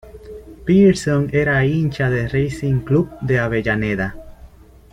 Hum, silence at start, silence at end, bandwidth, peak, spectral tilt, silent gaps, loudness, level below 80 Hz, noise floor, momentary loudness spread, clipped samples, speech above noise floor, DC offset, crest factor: none; 0.05 s; 0.45 s; 11.5 kHz; -2 dBFS; -7.5 dB/octave; none; -18 LUFS; -40 dBFS; -43 dBFS; 13 LU; under 0.1%; 26 dB; under 0.1%; 16 dB